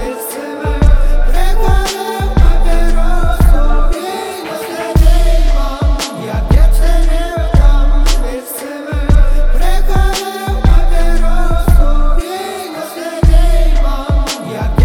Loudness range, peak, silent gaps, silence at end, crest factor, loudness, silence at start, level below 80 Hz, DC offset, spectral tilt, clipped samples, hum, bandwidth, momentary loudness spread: 1 LU; 0 dBFS; none; 0 s; 8 dB; -15 LUFS; 0 s; -10 dBFS; under 0.1%; -5.5 dB/octave; 0.4%; none; 15 kHz; 9 LU